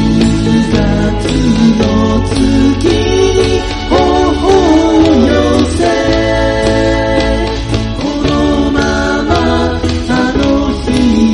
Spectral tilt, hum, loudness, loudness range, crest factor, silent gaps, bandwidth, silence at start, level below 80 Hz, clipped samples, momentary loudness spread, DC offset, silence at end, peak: -6 dB/octave; none; -11 LUFS; 3 LU; 10 dB; none; 11.5 kHz; 0 s; -20 dBFS; under 0.1%; 5 LU; under 0.1%; 0 s; 0 dBFS